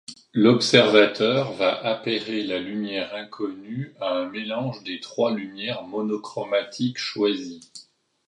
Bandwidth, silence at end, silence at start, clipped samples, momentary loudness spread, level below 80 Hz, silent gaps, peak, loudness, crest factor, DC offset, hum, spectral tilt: 11.5 kHz; 0.45 s; 0.1 s; under 0.1%; 15 LU; -68 dBFS; none; 0 dBFS; -23 LUFS; 24 dB; under 0.1%; none; -5 dB/octave